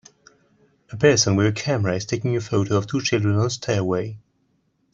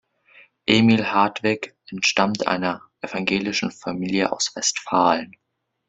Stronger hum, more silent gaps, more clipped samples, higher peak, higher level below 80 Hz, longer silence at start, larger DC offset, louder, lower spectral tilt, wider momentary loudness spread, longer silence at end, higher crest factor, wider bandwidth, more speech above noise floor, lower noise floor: neither; neither; neither; about the same, -2 dBFS vs -2 dBFS; about the same, -56 dBFS vs -60 dBFS; first, 0.9 s vs 0.65 s; neither; about the same, -21 LUFS vs -21 LUFS; first, -5 dB/octave vs -3.5 dB/octave; second, 8 LU vs 11 LU; first, 0.75 s vs 0.6 s; about the same, 20 dB vs 22 dB; about the same, 8 kHz vs 8.2 kHz; first, 46 dB vs 32 dB; first, -67 dBFS vs -53 dBFS